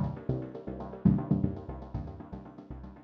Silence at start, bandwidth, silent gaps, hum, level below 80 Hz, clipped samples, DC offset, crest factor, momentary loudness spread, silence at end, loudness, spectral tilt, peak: 0 s; 4.7 kHz; none; none; -46 dBFS; under 0.1%; under 0.1%; 22 dB; 18 LU; 0 s; -33 LUFS; -11 dB/octave; -12 dBFS